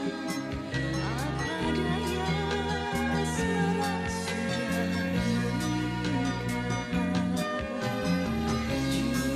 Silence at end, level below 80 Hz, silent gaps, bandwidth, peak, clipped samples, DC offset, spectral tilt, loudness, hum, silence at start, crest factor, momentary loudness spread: 0 s; -44 dBFS; none; 14.5 kHz; -16 dBFS; under 0.1%; under 0.1%; -5.5 dB/octave; -29 LUFS; none; 0 s; 14 dB; 3 LU